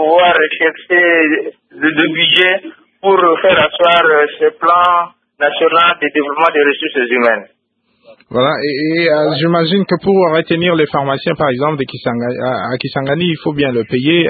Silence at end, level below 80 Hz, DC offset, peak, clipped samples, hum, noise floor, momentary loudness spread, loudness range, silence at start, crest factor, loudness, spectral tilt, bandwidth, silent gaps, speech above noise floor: 0 s; -52 dBFS; under 0.1%; 0 dBFS; under 0.1%; none; -60 dBFS; 9 LU; 4 LU; 0 s; 12 dB; -12 LUFS; -7.5 dB/octave; 4.9 kHz; none; 48 dB